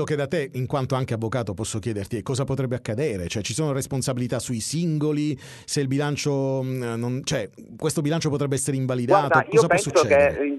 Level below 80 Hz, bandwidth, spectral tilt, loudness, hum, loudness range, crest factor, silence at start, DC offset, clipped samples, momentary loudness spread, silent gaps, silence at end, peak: -54 dBFS; 12 kHz; -5.5 dB/octave; -24 LUFS; none; 5 LU; 18 dB; 0 s; under 0.1%; under 0.1%; 10 LU; none; 0 s; -4 dBFS